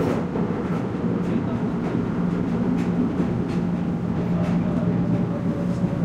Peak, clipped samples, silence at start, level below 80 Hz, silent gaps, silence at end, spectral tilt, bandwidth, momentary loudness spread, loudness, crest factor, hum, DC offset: -10 dBFS; under 0.1%; 0 s; -44 dBFS; none; 0 s; -9 dB/octave; 7.8 kHz; 3 LU; -24 LUFS; 12 dB; none; under 0.1%